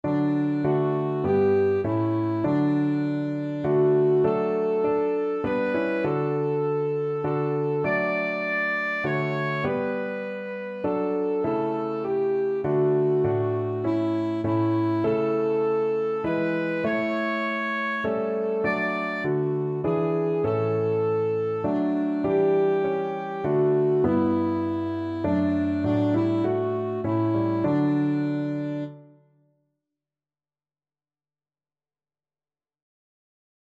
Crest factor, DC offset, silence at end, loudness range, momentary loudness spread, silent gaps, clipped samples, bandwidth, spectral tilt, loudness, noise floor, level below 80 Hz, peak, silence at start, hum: 14 dB; under 0.1%; 4.7 s; 3 LU; 5 LU; none; under 0.1%; 7 kHz; -9.5 dB/octave; -25 LUFS; under -90 dBFS; -60 dBFS; -10 dBFS; 0.05 s; none